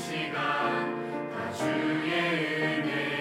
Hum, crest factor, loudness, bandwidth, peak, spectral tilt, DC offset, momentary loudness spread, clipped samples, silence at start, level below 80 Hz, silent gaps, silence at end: none; 14 dB; -29 LUFS; 16 kHz; -16 dBFS; -5 dB/octave; under 0.1%; 7 LU; under 0.1%; 0 s; -74 dBFS; none; 0 s